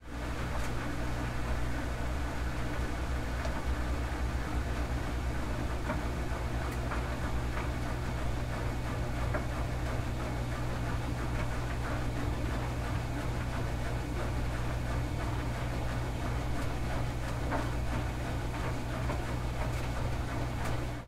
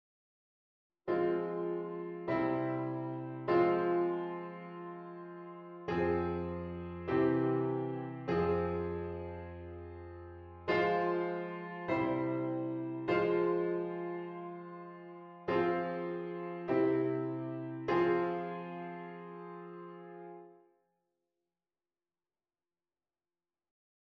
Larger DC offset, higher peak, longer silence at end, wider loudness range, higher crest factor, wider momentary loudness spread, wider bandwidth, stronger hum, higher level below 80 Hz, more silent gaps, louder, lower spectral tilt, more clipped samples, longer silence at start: neither; about the same, -20 dBFS vs -18 dBFS; second, 0 s vs 3.55 s; second, 0 LU vs 4 LU; about the same, 14 dB vs 18 dB; second, 1 LU vs 17 LU; first, 15 kHz vs 5.8 kHz; first, 60 Hz at -40 dBFS vs none; first, -38 dBFS vs -64 dBFS; neither; about the same, -35 LUFS vs -35 LUFS; second, -6 dB/octave vs -9 dB/octave; neither; second, 0 s vs 1.05 s